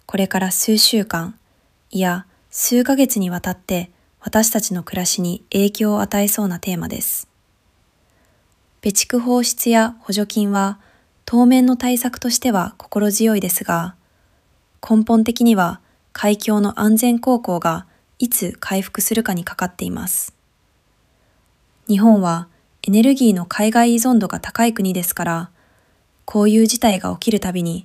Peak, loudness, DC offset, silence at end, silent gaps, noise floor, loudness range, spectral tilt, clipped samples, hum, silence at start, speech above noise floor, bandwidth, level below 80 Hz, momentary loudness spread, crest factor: -2 dBFS; -17 LUFS; under 0.1%; 0.05 s; none; -61 dBFS; 5 LU; -4 dB/octave; under 0.1%; none; 0.1 s; 44 dB; 16 kHz; -52 dBFS; 11 LU; 16 dB